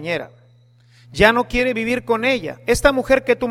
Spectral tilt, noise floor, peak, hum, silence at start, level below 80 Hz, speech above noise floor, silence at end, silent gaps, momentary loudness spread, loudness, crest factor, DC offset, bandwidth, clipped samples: -4.5 dB/octave; -52 dBFS; 0 dBFS; 60 Hz at -40 dBFS; 0 s; -36 dBFS; 34 dB; 0 s; none; 11 LU; -18 LUFS; 18 dB; under 0.1%; 16 kHz; under 0.1%